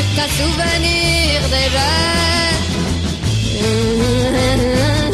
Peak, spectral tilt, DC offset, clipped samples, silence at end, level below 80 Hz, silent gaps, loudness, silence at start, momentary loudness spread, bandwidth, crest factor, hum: -4 dBFS; -4.5 dB/octave; under 0.1%; under 0.1%; 0 s; -24 dBFS; none; -15 LUFS; 0 s; 5 LU; 13.5 kHz; 12 dB; none